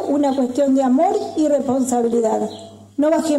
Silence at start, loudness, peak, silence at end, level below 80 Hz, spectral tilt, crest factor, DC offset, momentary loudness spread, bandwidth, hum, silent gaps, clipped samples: 0 s; -18 LUFS; -8 dBFS; 0 s; -62 dBFS; -5 dB/octave; 10 dB; under 0.1%; 8 LU; 13.5 kHz; none; none; under 0.1%